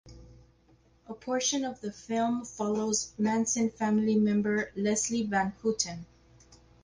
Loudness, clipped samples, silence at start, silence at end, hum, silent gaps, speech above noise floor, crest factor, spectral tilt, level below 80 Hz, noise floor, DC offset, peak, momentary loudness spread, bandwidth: -29 LUFS; under 0.1%; 0.05 s; 0.8 s; 60 Hz at -55 dBFS; none; 34 dB; 18 dB; -4 dB/octave; -62 dBFS; -63 dBFS; under 0.1%; -14 dBFS; 8 LU; 10.5 kHz